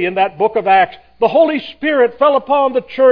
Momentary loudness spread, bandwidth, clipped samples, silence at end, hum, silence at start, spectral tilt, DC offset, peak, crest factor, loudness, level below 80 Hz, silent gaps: 5 LU; 5.2 kHz; under 0.1%; 0 s; none; 0 s; -7.5 dB/octave; under 0.1%; 0 dBFS; 12 dB; -14 LUFS; -56 dBFS; none